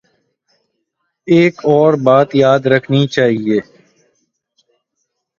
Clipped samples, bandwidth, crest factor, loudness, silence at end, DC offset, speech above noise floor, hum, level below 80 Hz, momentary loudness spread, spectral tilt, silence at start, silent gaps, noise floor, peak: under 0.1%; 7.4 kHz; 14 dB; -12 LUFS; 1.75 s; under 0.1%; 60 dB; none; -58 dBFS; 7 LU; -7 dB/octave; 1.25 s; none; -71 dBFS; 0 dBFS